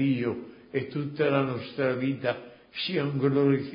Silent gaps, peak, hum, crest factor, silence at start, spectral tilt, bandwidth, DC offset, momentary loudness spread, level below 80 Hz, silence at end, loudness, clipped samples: none; -10 dBFS; none; 18 dB; 0 s; -11 dB/octave; 5.4 kHz; under 0.1%; 10 LU; -66 dBFS; 0 s; -28 LUFS; under 0.1%